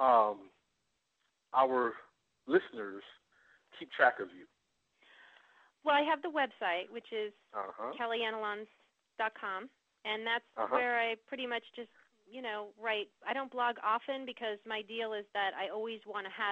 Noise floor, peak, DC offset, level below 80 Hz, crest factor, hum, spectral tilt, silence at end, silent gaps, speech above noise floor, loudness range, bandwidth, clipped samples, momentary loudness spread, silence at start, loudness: -82 dBFS; -12 dBFS; under 0.1%; -84 dBFS; 24 dB; none; -5 dB/octave; 0 s; none; 46 dB; 4 LU; 8.2 kHz; under 0.1%; 15 LU; 0 s; -35 LUFS